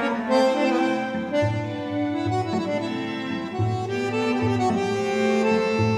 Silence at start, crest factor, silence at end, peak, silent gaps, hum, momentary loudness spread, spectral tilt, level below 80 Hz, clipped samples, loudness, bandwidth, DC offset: 0 s; 16 dB; 0 s; -8 dBFS; none; none; 7 LU; -6.5 dB/octave; -60 dBFS; under 0.1%; -24 LUFS; 11.5 kHz; under 0.1%